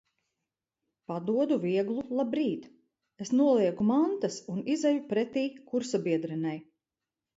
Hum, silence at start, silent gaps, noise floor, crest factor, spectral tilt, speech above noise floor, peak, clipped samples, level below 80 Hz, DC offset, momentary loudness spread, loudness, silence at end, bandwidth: none; 1.1 s; none; -90 dBFS; 16 dB; -6 dB/octave; 62 dB; -14 dBFS; under 0.1%; -74 dBFS; under 0.1%; 10 LU; -29 LUFS; 0.75 s; 8 kHz